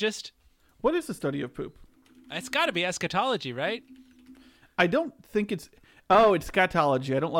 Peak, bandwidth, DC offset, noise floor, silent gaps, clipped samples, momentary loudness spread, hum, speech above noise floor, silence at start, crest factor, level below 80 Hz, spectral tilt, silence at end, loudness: -8 dBFS; 16.5 kHz; under 0.1%; -54 dBFS; none; under 0.1%; 15 LU; none; 28 dB; 0 s; 20 dB; -56 dBFS; -4.5 dB/octave; 0 s; -27 LUFS